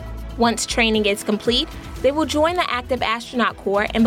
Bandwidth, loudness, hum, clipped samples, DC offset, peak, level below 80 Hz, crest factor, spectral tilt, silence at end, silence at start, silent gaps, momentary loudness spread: 16.5 kHz; -20 LUFS; none; under 0.1%; under 0.1%; -6 dBFS; -38 dBFS; 14 dB; -3.5 dB/octave; 0 s; 0 s; none; 5 LU